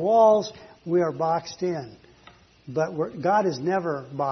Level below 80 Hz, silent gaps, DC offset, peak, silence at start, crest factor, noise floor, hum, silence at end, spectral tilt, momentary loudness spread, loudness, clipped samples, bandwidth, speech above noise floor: -66 dBFS; none; under 0.1%; -8 dBFS; 0 s; 16 dB; -53 dBFS; none; 0 s; -6.5 dB/octave; 15 LU; -24 LUFS; under 0.1%; 6.4 kHz; 30 dB